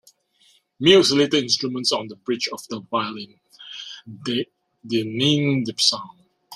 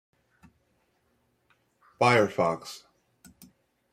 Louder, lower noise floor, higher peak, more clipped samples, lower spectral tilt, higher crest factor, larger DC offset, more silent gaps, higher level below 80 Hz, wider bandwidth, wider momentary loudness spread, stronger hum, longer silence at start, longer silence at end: first, -20 LUFS vs -25 LUFS; second, -60 dBFS vs -72 dBFS; first, -2 dBFS vs -8 dBFS; neither; about the same, -4 dB/octave vs -5 dB/octave; about the same, 22 dB vs 24 dB; neither; neither; first, -64 dBFS vs -72 dBFS; about the same, 14.5 kHz vs 15.5 kHz; about the same, 20 LU vs 21 LU; neither; second, 0.8 s vs 2 s; second, 0 s vs 1.15 s